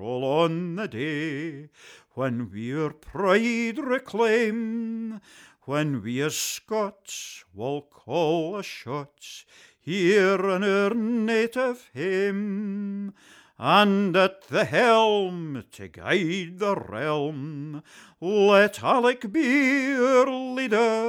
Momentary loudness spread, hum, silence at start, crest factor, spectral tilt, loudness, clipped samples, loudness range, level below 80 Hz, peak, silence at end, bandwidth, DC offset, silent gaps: 16 LU; none; 0 s; 18 dB; -5 dB/octave; -24 LUFS; under 0.1%; 7 LU; -66 dBFS; -6 dBFS; 0 s; 18.5 kHz; under 0.1%; none